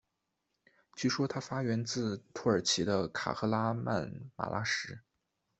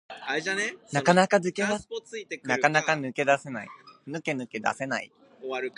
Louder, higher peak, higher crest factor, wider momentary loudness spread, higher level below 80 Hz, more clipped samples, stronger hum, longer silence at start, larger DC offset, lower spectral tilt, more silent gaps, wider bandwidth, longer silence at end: second, -33 LUFS vs -27 LUFS; second, -14 dBFS vs -4 dBFS; about the same, 20 dB vs 24 dB; second, 10 LU vs 16 LU; about the same, -68 dBFS vs -70 dBFS; neither; neither; first, 0.95 s vs 0.1 s; neither; about the same, -4.5 dB/octave vs -4.5 dB/octave; neither; second, 8.2 kHz vs 11 kHz; first, 0.6 s vs 0.1 s